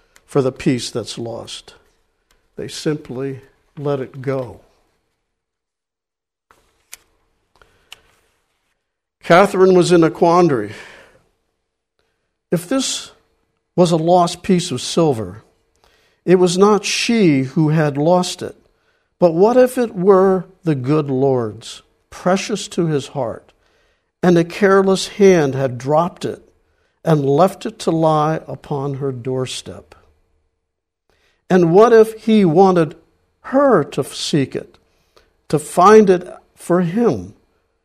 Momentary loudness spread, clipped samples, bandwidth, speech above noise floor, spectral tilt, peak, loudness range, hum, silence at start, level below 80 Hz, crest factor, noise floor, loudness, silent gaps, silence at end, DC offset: 16 LU; under 0.1%; 15 kHz; 72 dB; -6 dB/octave; 0 dBFS; 11 LU; none; 0.3 s; -56 dBFS; 18 dB; -87 dBFS; -16 LUFS; none; 0.55 s; under 0.1%